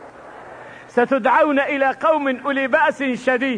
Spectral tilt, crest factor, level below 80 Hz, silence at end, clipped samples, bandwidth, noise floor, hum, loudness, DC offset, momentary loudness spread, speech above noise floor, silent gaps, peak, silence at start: -5 dB/octave; 16 dB; -62 dBFS; 0 s; under 0.1%; 10 kHz; -39 dBFS; none; -18 LUFS; under 0.1%; 22 LU; 21 dB; none; -4 dBFS; 0 s